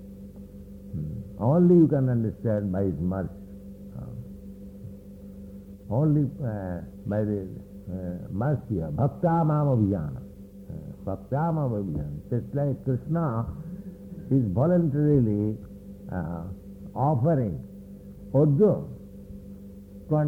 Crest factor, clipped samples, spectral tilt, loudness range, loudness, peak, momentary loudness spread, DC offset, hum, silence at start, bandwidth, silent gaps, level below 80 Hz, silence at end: 18 dB; under 0.1%; -11.5 dB/octave; 6 LU; -26 LUFS; -8 dBFS; 21 LU; under 0.1%; none; 0 s; 2.9 kHz; none; -48 dBFS; 0 s